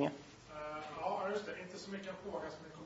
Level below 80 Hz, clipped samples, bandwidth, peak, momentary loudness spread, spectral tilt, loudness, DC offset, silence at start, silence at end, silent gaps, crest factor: -70 dBFS; under 0.1%; 7.6 kHz; -22 dBFS; 9 LU; -4 dB/octave; -43 LUFS; under 0.1%; 0 s; 0 s; none; 22 dB